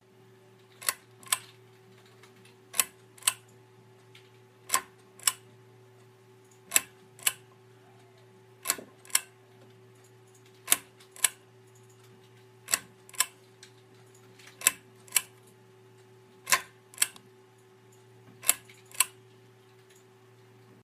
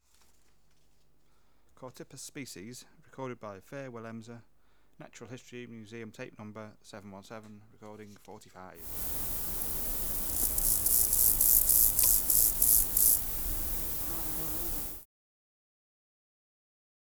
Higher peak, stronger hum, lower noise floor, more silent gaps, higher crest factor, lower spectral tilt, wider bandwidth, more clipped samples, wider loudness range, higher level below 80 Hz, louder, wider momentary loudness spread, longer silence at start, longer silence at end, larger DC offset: first, -2 dBFS vs -10 dBFS; neither; second, -58 dBFS vs -70 dBFS; neither; first, 34 dB vs 22 dB; second, 1 dB/octave vs -1.5 dB/octave; second, 15.5 kHz vs over 20 kHz; neither; second, 4 LU vs 24 LU; second, -82 dBFS vs -46 dBFS; second, -29 LUFS vs -25 LUFS; second, 21 LU vs 25 LU; second, 0.8 s vs 1.8 s; second, 1.75 s vs 2 s; second, under 0.1% vs 0.1%